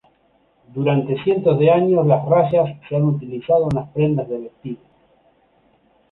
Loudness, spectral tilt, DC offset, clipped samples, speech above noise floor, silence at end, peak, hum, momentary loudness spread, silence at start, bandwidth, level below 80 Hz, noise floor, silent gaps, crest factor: -18 LUFS; -10 dB/octave; under 0.1%; under 0.1%; 42 dB; 1.35 s; -2 dBFS; none; 16 LU; 0.75 s; 4.2 kHz; -52 dBFS; -60 dBFS; none; 18 dB